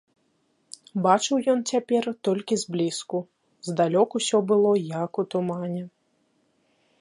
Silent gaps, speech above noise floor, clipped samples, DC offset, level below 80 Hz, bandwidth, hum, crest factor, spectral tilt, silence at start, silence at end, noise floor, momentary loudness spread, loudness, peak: none; 45 dB; under 0.1%; under 0.1%; -74 dBFS; 11.5 kHz; none; 20 dB; -5 dB/octave; 0.95 s; 1.1 s; -69 dBFS; 13 LU; -25 LUFS; -6 dBFS